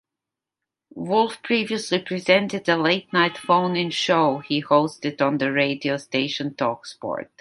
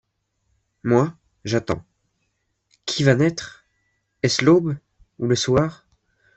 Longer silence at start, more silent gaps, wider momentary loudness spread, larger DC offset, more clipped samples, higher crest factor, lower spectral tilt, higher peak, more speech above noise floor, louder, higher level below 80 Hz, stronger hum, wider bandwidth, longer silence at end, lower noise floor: about the same, 0.95 s vs 0.85 s; neither; second, 7 LU vs 16 LU; neither; neither; about the same, 20 dB vs 20 dB; about the same, -5 dB/octave vs -5.5 dB/octave; about the same, -2 dBFS vs -2 dBFS; first, 65 dB vs 53 dB; about the same, -22 LUFS vs -21 LUFS; second, -70 dBFS vs -54 dBFS; neither; first, 11.5 kHz vs 8.4 kHz; second, 0.15 s vs 0.65 s; first, -87 dBFS vs -72 dBFS